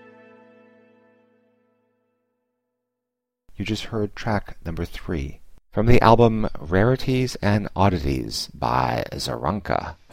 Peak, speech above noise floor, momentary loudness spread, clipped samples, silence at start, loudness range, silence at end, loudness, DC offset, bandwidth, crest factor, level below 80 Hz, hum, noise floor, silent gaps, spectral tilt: 0 dBFS; 62 dB; 14 LU; under 0.1%; 0 s; 12 LU; 0.2 s; -22 LUFS; under 0.1%; 16 kHz; 22 dB; -36 dBFS; none; -83 dBFS; none; -6.5 dB/octave